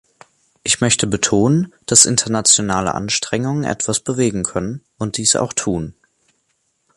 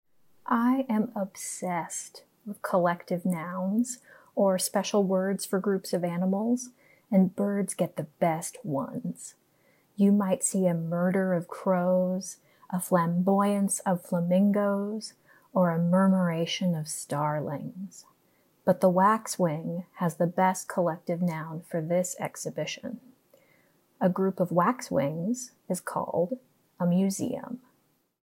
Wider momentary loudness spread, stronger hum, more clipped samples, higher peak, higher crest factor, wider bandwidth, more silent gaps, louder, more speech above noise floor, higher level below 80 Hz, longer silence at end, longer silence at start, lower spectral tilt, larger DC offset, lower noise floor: about the same, 13 LU vs 13 LU; neither; neither; first, 0 dBFS vs -10 dBFS; about the same, 18 dB vs 18 dB; about the same, 16 kHz vs 16.5 kHz; neither; first, -16 LUFS vs -28 LUFS; first, 49 dB vs 43 dB; first, -46 dBFS vs -78 dBFS; first, 1.05 s vs 0.7 s; first, 0.65 s vs 0.45 s; second, -3 dB/octave vs -6 dB/octave; neither; about the same, -67 dBFS vs -70 dBFS